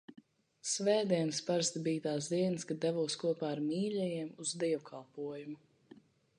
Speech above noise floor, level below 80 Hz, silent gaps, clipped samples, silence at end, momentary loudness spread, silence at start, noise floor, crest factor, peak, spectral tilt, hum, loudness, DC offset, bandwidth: 26 dB; -82 dBFS; none; under 0.1%; 0.4 s; 12 LU; 0.1 s; -61 dBFS; 18 dB; -18 dBFS; -4.5 dB/octave; none; -35 LUFS; under 0.1%; 11 kHz